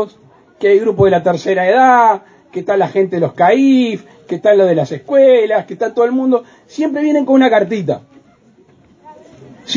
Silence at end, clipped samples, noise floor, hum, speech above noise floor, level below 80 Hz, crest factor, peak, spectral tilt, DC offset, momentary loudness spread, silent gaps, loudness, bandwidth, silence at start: 0 s; under 0.1%; -48 dBFS; none; 36 dB; -52 dBFS; 14 dB; 0 dBFS; -6.5 dB/octave; under 0.1%; 12 LU; none; -13 LUFS; 7.6 kHz; 0 s